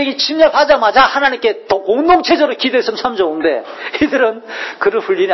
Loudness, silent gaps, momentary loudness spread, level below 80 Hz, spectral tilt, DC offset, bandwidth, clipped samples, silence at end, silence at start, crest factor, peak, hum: -13 LUFS; none; 8 LU; -48 dBFS; -3.5 dB/octave; under 0.1%; 6.2 kHz; under 0.1%; 0 s; 0 s; 14 dB; 0 dBFS; none